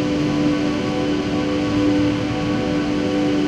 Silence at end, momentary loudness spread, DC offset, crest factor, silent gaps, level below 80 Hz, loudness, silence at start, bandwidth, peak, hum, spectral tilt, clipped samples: 0 s; 3 LU; under 0.1%; 12 dB; none; -40 dBFS; -20 LUFS; 0 s; 9.6 kHz; -8 dBFS; none; -6.5 dB/octave; under 0.1%